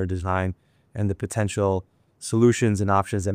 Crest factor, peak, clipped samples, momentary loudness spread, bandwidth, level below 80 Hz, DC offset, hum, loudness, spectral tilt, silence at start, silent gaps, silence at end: 18 dB; -6 dBFS; under 0.1%; 13 LU; 15 kHz; -48 dBFS; under 0.1%; none; -24 LUFS; -6.5 dB/octave; 0 s; none; 0 s